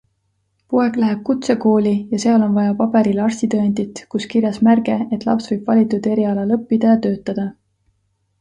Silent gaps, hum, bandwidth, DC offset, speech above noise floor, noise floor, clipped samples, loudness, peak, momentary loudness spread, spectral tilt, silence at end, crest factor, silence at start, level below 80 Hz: none; none; 9.4 kHz; under 0.1%; 51 dB; -67 dBFS; under 0.1%; -17 LUFS; -2 dBFS; 7 LU; -7 dB/octave; 0.9 s; 14 dB; 0.7 s; -58 dBFS